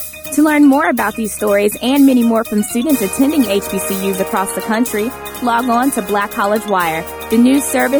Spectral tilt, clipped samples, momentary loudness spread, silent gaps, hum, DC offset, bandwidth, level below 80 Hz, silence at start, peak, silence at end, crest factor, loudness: -4 dB/octave; under 0.1%; 8 LU; none; none; under 0.1%; over 20 kHz; -44 dBFS; 0 s; -2 dBFS; 0 s; 12 dB; -14 LUFS